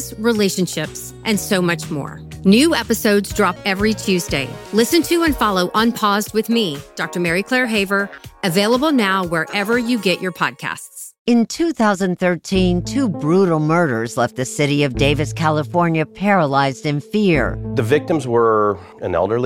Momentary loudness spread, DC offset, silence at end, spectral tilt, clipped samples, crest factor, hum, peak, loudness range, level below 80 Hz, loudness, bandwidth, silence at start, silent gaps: 7 LU; under 0.1%; 0 s; -5 dB/octave; under 0.1%; 16 dB; none; -2 dBFS; 2 LU; -40 dBFS; -18 LUFS; 17 kHz; 0 s; 11.19-11.25 s